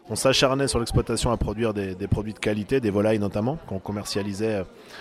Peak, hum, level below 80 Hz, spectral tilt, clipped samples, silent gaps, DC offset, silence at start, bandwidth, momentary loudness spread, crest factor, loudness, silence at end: -6 dBFS; none; -40 dBFS; -5 dB/octave; under 0.1%; none; under 0.1%; 0.05 s; 15 kHz; 10 LU; 18 dB; -25 LUFS; 0 s